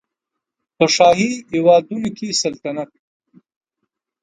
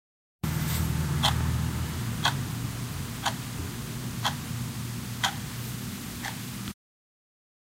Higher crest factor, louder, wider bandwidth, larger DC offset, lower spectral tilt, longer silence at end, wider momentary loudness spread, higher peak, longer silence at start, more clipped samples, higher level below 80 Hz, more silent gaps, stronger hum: second, 18 dB vs 24 dB; first, -16 LUFS vs -31 LUFS; second, 9.4 kHz vs 16 kHz; neither; about the same, -4 dB/octave vs -4 dB/octave; first, 1.35 s vs 1 s; first, 14 LU vs 9 LU; first, 0 dBFS vs -8 dBFS; first, 0.8 s vs 0.45 s; neither; second, -58 dBFS vs -42 dBFS; neither; neither